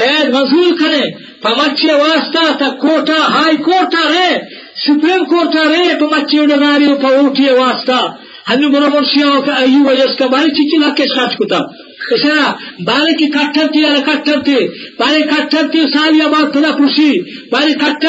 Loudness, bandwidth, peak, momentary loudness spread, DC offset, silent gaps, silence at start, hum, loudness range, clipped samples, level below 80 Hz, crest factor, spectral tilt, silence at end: -11 LUFS; 8 kHz; -2 dBFS; 6 LU; under 0.1%; none; 0 s; none; 2 LU; under 0.1%; -68 dBFS; 8 dB; -1 dB/octave; 0 s